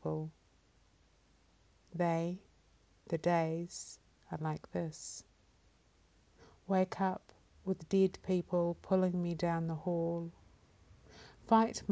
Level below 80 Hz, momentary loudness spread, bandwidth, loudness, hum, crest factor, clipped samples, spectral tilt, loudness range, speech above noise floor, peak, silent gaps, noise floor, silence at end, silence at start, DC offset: -66 dBFS; 17 LU; 8 kHz; -36 LUFS; none; 22 dB; under 0.1%; -6.5 dB/octave; 6 LU; 34 dB; -16 dBFS; none; -69 dBFS; 0 s; 0.05 s; under 0.1%